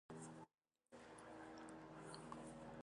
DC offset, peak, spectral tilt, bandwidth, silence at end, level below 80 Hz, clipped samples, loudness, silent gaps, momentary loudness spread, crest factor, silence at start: under 0.1%; -38 dBFS; -5 dB/octave; 11 kHz; 0 s; -78 dBFS; under 0.1%; -58 LUFS; none; 9 LU; 20 dB; 0.1 s